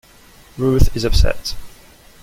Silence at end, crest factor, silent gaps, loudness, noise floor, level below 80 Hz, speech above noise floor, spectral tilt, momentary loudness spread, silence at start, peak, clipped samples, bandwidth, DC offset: 0.55 s; 16 dB; none; -19 LUFS; -46 dBFS; -20 dBFS; 32 dB; -5.5 dB/octave; 17 LU; 0.55 s; 0 dBFS; under 0.1%; 16 kHz; under 0.1%